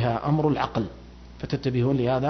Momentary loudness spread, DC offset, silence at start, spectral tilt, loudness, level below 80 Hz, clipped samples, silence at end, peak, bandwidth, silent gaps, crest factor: 13 LU; under 0.1%; 0 s; -8.5 dB/octave; -25 LUFS; -46 dBFS; under 0.1%; 0 s; -10 dBFS; 6.4 kHz; none; 16 dB